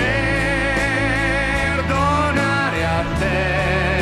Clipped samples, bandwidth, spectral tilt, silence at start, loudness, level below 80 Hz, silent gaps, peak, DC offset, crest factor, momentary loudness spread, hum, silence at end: under 0.1%; 14 kHz; -5.5 dB/octave; 0 s; -18 LUFS; -28 dBFS; none; -6 dBFS; 0.3%; 14 dB; 2 LU; none; 0 s